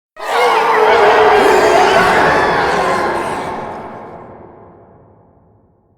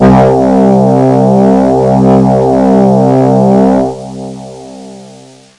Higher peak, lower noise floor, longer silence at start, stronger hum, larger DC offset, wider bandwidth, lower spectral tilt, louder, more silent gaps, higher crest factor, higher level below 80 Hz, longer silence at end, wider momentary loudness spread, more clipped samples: about the same, 0 dBFS vs 0 dBFS; first, -52 dBFS vs -35 dBFS; first, 0.15 s vs 0 s; neither; neither; first, 18 kHz vs 10.5 kHz; second, -4 dB/octave vs -9 dB/octave; second, -11 LUFS vs -7 LUFS; neither; first, 14 dB vs 8 dB; second, -44 dBFS vs -32 dBFS; first, 1.6 s vs 0.5 s; about the same, 18 LU vs 17 LU; second, under 0.1% vs 0.4%